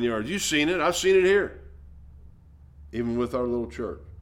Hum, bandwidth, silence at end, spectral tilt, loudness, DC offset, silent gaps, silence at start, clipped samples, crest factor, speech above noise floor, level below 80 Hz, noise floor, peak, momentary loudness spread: none; 16.5 kHz; 0 s; -4 dB/octave; -25 LUFS; under 0.1%; none; 0 s; under 0.1%; 16 dB; 26 dB; -46 dBFS; -51 dBFS; -10 dBFS; 14 LU